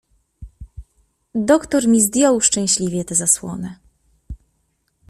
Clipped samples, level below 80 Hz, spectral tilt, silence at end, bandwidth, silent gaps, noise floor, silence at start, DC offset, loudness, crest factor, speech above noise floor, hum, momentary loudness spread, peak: under 0.1%; -44 dBFS; -3.5 dB/octave; 0.75 s; 15 kHz; none; -67 dBFS; 0.4 s; under 0.1%; -16 LUFS; 20 dB; 50 dB; none; 14 LU; 0 dBFS